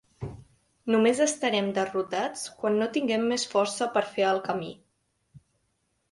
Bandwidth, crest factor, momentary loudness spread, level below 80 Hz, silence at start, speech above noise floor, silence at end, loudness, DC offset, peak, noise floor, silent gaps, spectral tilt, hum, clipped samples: 11.5 kHz; 18 dB; 14 LU; -62 dBFS; 0.2 s; 48 dB; 0.75 s; -27 LUFS; under 0.1%; -10 dBFS; -74 dBFS; none; -4 dB/octave; none; under 0.1%